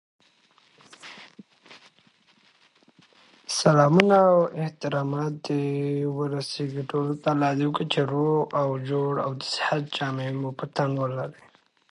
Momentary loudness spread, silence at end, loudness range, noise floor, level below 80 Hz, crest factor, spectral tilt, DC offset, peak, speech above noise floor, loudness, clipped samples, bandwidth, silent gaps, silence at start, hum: 13 LU; 0.6 s; 5 LU; -61 dBFS; -70 dBFS; 26 dB; -6 dB/octave; under 0.1%; 0 dBFS; 37 dB; -25 LUFS; under 0.1%; 11.5 kHz; none; 1.05 s; none